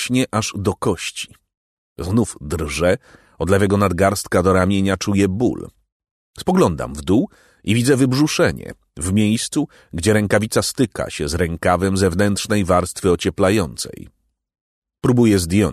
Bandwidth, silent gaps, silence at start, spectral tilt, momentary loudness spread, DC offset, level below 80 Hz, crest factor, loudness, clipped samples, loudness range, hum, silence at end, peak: 13.5 kHz; 1.57-1.96 s, 5.92-6.00 s, 6.11-6.34 s, 14.61-14.82 s; 0 s; -5.5 dB/octave; 11 LU; under 0.1%; -40 dBFS; 16 dB; -18 LUFS; under 0.1%; 2 LU; none; 0 s; -2 dBFS